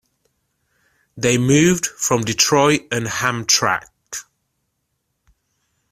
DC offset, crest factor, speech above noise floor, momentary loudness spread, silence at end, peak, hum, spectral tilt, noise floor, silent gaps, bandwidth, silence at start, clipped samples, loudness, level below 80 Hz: under 0.1%; 20 dB; 56 dB; 16 LU; 1.7 s; 0 dBFS; none; -3.5 dB/octave; -73 dBFS; none; 16 kHz; 1.15 s; under 0.1%; -17 LUFS; -52 dBFS